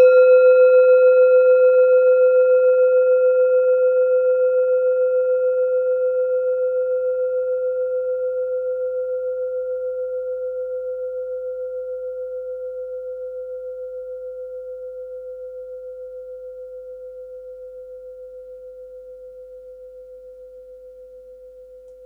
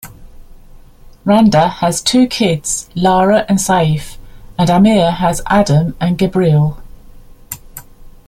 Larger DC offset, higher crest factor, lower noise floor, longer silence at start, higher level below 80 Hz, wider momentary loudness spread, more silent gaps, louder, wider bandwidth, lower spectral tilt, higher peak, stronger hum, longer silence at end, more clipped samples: neither; about the same, 14 dB vs 14 dB; first, -42 dBFS vs -38 dBFS; about the same, 0 s vs 0.05 s; second, -62 dBFS vs -36 dBFS; first, 24 LU vs 13 LU; neither; second, -18 LUFS vs -13 LUFS; second, 4.2 kHz vs 16 kHz; about the same, -5 dB/octave vs -5.5 dB/octave; second, -4 dBFS vs 0 dBFS; neither; second, 0 s vs 0.15 s; neither